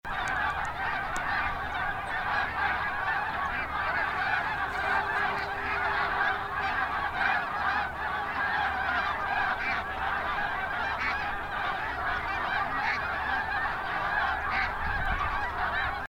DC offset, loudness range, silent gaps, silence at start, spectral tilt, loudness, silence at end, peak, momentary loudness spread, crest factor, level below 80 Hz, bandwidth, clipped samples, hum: under 0.1%; 1 LU; none; 0.05 s; -4 dB/octave; -29 LUFS; 0 s; -14 dBFS; 3 LU; 16 dB; -46 dBFS; 16 kHz; under 0.1%; none